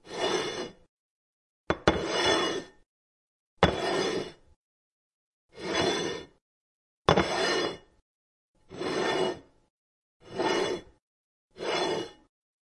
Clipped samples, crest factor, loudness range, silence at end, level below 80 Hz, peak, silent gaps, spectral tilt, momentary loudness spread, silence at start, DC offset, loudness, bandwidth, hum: under 0.1%; 26 dB; 4 LU; 0.5 s; -54 dBFS; -6 dBFS; 0.89-1.67 s, 2.86-3.57 s, 4.56-5.49 s, 6.41-7.05 s, 8.02-8.54 s, 9.70-10.20 s, 11.02-11.50 s; -4 dB/octave; 16 LU; 0.05 s; under 0.1%; -29 LUFS; 11.5 kHz; none